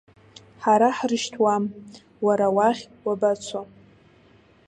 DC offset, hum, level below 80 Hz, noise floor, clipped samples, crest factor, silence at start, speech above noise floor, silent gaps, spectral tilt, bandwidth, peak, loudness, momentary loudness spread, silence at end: under 0.1%; none; -66 dBFS; -55 dBFS; under 0.1%; 18 dB; 0.6 s; 33 dB; none; -5 dB/octave; 10.5 kHz; -6 dBFS; -23 LUFS; 12 LU; 1.05 s